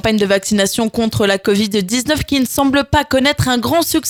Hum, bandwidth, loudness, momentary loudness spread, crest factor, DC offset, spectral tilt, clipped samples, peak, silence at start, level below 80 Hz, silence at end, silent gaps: none; over 20 kHz; -15 LUFS; 3 LU; 14 dB; under 0.1%; -4 dB/octave; under 0.1%; 0 dBFS; 0.05 s; -36 dBFS; 0 s; none